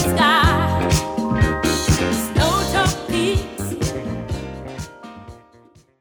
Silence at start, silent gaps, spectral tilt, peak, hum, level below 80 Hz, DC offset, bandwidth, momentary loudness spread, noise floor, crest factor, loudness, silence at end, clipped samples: 0 s; none; -4.5 dB/octave; -4 dBFS; none; -30 dBFS; under 0.1%; over 20 kHz; 17 LU; -51 dBFS; 16 dB; -19 LUFS; 0.65 s; under 0.1%